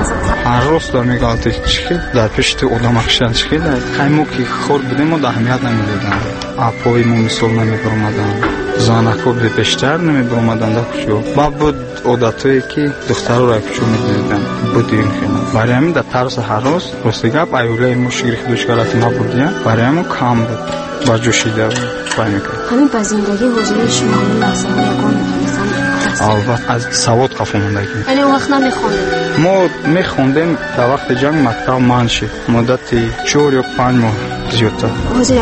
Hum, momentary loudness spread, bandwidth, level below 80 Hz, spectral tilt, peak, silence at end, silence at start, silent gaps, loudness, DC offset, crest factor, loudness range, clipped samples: none; 4 LU; 8.8 kHz; -32 dBFS; -5.5 dB/octave; 0 dBFS; 0 s; 0 s; none; -13 LUFS; under 0.1%; 12 dB; 1 LU; under 0.1%